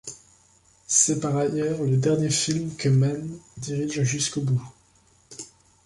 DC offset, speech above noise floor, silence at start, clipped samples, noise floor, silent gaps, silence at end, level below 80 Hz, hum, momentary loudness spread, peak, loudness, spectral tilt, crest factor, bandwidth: under 0.1%; 36 dB; 0.05 s; under 0.1%; -60 dBFS; none; 0.4 s; -58 dBFS; none; 20 LU; -4 dBFS; -23 LUFS; -4.5 dB/octave; 20 dB; 11.5 kHz